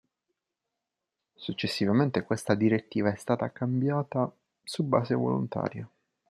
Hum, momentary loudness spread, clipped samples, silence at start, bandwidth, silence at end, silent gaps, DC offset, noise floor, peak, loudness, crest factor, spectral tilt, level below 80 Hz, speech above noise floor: none; 12 LU; under 0.1%; 1.4 s; 13.5 kHz; 0.45 s; none; under 0.1%; -87 dBFS; -8 dBFS; -29 LUFS; 22 dB; -7 dB/octave; -68 dBFS; 59 dB